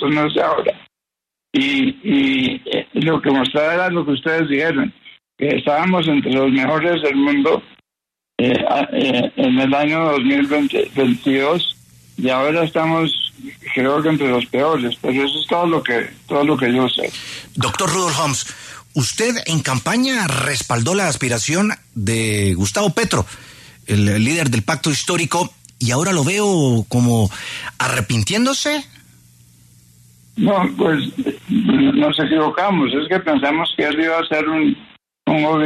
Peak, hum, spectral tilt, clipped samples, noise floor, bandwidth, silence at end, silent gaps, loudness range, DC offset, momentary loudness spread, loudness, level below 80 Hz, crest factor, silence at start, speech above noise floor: -4 dBFS; none; -4.5 dB/octave; under 0.1%; -84 dBFS; 13.5 kHz; 0 s; none; 2 LU; under 0.1%; 7 LU; -17 LUFS; -50 dBFS; 14 dB; 0 s; 67 dB